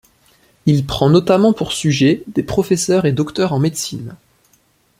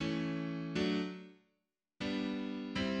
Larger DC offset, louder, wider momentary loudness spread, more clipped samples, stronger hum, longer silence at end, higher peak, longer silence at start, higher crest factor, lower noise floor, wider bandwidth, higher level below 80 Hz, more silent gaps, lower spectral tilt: neither; first, -16 LUFS vs -38 LUFS; about the same, 9 LU vs 8 LU; neither; neither; first, 0.85 s vs 0 s; first, -2 dBFS vs -22 dBFS; first, 0.65 s vs 0 s; about the same, 16 dB vs 16 dB; second, -57 dBFS vs -85 dBFS; first, 16 kHz vs 9.2 kHz; first, -44 dBFS vs -64 dBFS; neither; about the same, -5.5 dB/octave vs -6 dB/octave